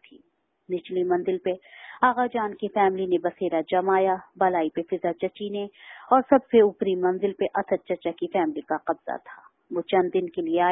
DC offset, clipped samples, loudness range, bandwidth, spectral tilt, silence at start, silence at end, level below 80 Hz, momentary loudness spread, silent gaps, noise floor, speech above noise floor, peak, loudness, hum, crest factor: under 0.1%; under 0.1%; 4 LU; 4 kHz; -10.5 dB/octave; 0.7 s; 0 s; -68 dBFS; 13 LU; none; -66 dBFS; 41 dB; -4 dBFS; -25 LUFS; none; 20 dB